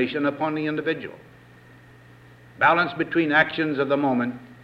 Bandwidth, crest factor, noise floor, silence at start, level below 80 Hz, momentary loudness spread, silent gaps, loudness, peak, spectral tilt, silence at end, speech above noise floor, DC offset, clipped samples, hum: 6.6 kHz; 20 dB; -49 dBFS; 0 s; -64 dBFS; 9 LU; none; -23 LUFS; -6 dBFS; -7.5 dB/octave; 0.1 s; 27 dB; under 0.1%; under 0.1%; 60 Hz at -55 dBFS